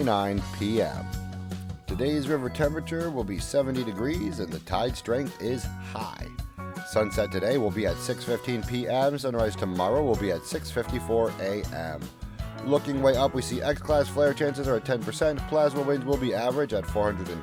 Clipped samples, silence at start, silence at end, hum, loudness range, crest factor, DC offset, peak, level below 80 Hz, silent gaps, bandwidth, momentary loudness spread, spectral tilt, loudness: under 0.1%; 0 s; 0 s; none; 4 LU; 16 dB; under 0.1%; -10 dBFS; -42 dBFS; none; 18.5 kHz; 11 LU; -6 dB/octave; -28 LUFS